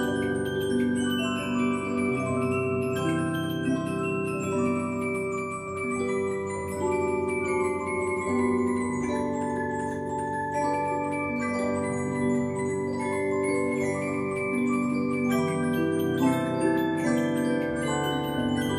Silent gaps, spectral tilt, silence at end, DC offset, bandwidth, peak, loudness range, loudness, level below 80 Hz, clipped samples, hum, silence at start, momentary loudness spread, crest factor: none; -6 dB/octave; 0 s; under 0.1%; 14.5 kHz; -12 dBFS; 3 LU; -27 LUFS; -58 dBFS; under 0.1%; none; 0 s; 4 LU; 14 dB